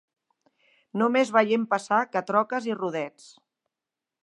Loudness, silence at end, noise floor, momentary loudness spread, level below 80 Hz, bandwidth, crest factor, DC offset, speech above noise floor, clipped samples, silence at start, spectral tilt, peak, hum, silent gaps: -25 LUFS; 1.15 s; -88 dBFS; 11 LU; -82 dBFS; 11 kHz; 22 dB; under 0.1%; 64 dB; under 0.1%; 0.95 s; -5 dB/octave; -6 dBFS; none; none